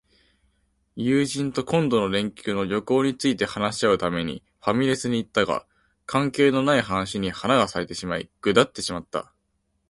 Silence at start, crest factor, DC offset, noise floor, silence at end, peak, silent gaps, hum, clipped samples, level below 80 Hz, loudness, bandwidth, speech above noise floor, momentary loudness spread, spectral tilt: 0.95 s; 20 dB; under 0.1%; -72 dBFS; 0.65 s; -4 dBFS; none; none; under 0.1%; -54 dBFS; -24 LUFS; 11.5 kHz; 49 dB; 9 LU; -5 dB/octave